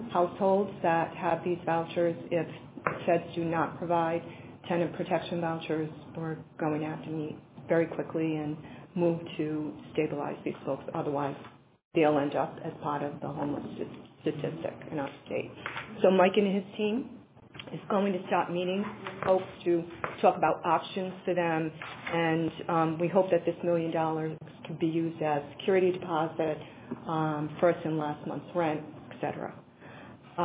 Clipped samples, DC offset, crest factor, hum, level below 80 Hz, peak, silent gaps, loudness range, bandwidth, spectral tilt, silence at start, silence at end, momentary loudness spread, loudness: under 0.1%; under 0.1%; 22 dB; none; -66 dBFS; -10 dBFS; 11.85-11.91 s; 4 LU; 4 kHz; -5.5 dB/octave; 0 s; 0 s; 13 LU; -31 LUFS